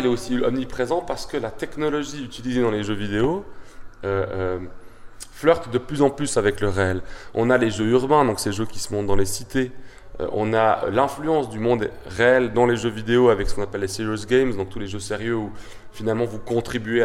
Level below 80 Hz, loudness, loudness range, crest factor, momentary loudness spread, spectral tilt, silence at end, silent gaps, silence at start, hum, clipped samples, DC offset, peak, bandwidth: -40 dBFS; -23 LUFS; 5 LU; 18 dB; 12 LU; -5.5 dB/octave; 0 s; none; 0 s; none; under 0.1%; under 0.1%; -4 dBFS; 15.5 kHz